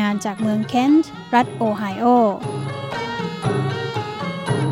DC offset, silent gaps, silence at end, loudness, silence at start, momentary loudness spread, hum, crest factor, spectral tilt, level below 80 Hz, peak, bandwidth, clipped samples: under 0.1%; none; 0 s; -20 LUFS; 0 s; 10 LU; none; 18 dB; -6.5 dB/octave; -56 dBFS; -2 dBFS; 16 kHz; under 0.1%